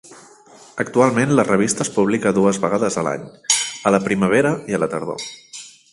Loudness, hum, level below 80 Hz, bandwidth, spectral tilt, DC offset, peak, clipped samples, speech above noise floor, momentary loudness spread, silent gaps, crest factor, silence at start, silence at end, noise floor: -18 LUFS; none; -56 dBFS; 11.5 kHz; -4.5 dB/octave; under 0.1%; 0 dBFS; under 0.1%; 28 dB; 14 LU; none; 18 dB; 0.1 s; 0.25 s; -46 dBFS